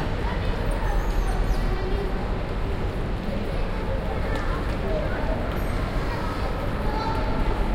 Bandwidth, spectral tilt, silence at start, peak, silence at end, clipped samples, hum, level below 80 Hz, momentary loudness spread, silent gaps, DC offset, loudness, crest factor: 15.5 kHz; -7 dB/octave; 0 s; -10 dBFS; 0 s; under 0.1%; none; -26 dBFS; 2 LU; none; under 0.1%; -28 LUFS; 14 dB